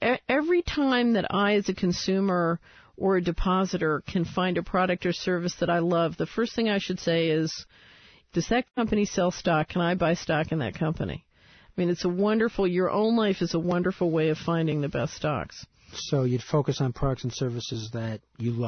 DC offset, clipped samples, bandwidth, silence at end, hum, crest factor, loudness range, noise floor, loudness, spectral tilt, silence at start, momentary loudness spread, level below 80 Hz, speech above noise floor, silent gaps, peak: under 0.1%; under 0.1%; 6.6 kHz; 0 s; none; 14 dB; 2 LU; -56 dBFS; -26 LUFS; -6 dB/octave; 0 s; 9 LU; -46 dBFS; 30 dB; none; -12 dBFS